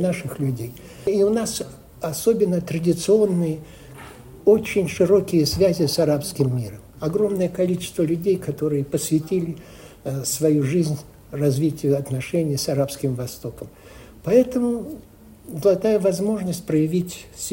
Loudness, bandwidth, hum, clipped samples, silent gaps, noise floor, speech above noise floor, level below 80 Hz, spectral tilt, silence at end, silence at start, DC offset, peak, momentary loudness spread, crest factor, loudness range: -22 LUFS; 16.5 kHz; none; under 0.1%; none; -41 dBFS; 20 dB; -50 dBFS; -6 dB/octave; 0 s; 0 s; under 0.1%; -4 dBFS; 16 LU; 18 dB; 3 LU